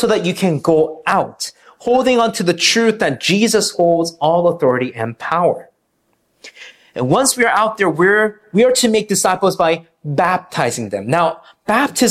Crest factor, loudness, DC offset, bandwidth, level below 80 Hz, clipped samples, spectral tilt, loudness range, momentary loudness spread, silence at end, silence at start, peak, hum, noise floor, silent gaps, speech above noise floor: 14 dB; -15 LUFS; under 0.1%; 15 kHz; -54 dBFS; under 0.1%; -4 dB/octave; 4 LU; 10 LU; 0 s; 0 s; -2 dBFS; none; -64 dBFS; none; 49 dB